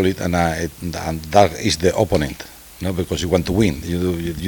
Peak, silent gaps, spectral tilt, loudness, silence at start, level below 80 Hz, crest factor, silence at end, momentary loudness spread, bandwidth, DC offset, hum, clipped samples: 0 dBFS; none; -5.5 dB/octave; -20 LUFS; 0 s; -36 dBFS; 20 dB; 0 s; 11 LU; 19 kHz; under 0.1%; none; under 0.1%